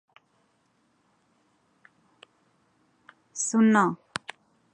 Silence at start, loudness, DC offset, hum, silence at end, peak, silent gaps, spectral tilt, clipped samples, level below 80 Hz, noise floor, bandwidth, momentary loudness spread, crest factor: 3.35 s; -24 LUFS; under 0.1%; none; 0.8 s; -8 dBFS; none; -4.5 dB/octave; under 0.1%; -78 dBFS; -69 dBFS; 11 kHz; 20 LU; 22 dB